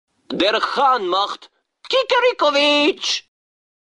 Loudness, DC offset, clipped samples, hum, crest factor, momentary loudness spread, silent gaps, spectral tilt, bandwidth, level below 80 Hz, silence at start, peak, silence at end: -17 LUFS; under 0.1%; under 0.1%; none; 14 dB; 10 LU; none; -2 dB/octave; 11 kHz; -64 dBFS; 0.3 s; -4 dBFS; 0.65 s